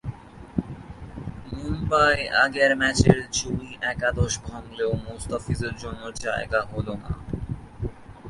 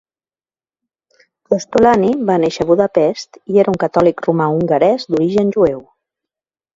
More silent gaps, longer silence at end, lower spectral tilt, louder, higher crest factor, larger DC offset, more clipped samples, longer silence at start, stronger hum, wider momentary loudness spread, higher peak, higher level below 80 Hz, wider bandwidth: neither; second, 0 s vs 0.95 s; second, -4.5 dB/octave vs -7 dB/octave; second, -25 LUFS vs -14 LUFS; first, 24 dB vs 16 dB; neither; neither; second, 0.05 s vs 1.5 s; neither; first, 18 LU vs 5 LU; about the same, -2 dBFS vs 0 dBFS; first, -38 dBFS vs -50 dBFS; first, 11.5 kHz vs 7.8 kHz